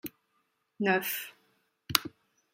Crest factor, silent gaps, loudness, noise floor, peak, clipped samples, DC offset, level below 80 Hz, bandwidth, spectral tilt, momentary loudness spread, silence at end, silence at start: 34 dB; none; -30 LUFS; -76 dBFS; 0 dBFS; under 0.1%; under 0.1%; -70 dBFS; 16.5 kHz; -3 dB/octave; 17 LU; 0.45 s; 0.05 s